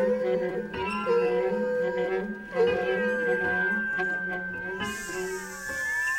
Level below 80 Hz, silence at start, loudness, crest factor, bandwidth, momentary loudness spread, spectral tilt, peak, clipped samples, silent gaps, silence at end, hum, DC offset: -56 dBFS; 0 s; -28 LUFS; 14 dB; 16.5 kHz; 7 LU; -4.5 dB/octave; -14 dBFS; under 0.1%; none; 0 s; none; under 0.1%